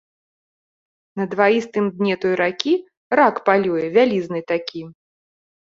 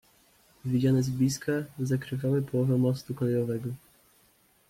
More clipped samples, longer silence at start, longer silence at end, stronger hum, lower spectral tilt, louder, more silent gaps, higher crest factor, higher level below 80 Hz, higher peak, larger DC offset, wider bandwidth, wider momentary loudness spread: neither; first, 1.15 s vs 0.65 s; second, 0.75 s vs 0.9 s; neither; about the same, -6 dB/octave vs -7 dB/octave; first, -19 LUFS vs -28 LUFS; first, 2.97-3.10 s vs none; first, 20 dB vs 14 dB; about the same, -66 dBFS vs -62 dBFS; first, -2 dBFS vs -14 dBFS; neither; second, 7.6 kHz vs 16 kHz; about the same, 9 LU vs 8 LU